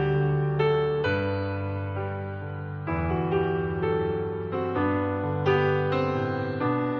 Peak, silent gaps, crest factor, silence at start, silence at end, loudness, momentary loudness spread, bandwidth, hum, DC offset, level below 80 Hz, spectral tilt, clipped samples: -10 dBFS; none; 16 dB; 0 s; 0 s; -27 LUFS; 8 LU; 6.2 kHz; none; under 0.1%; -52 dBFS; -6.5 dB/octave; under 0.1%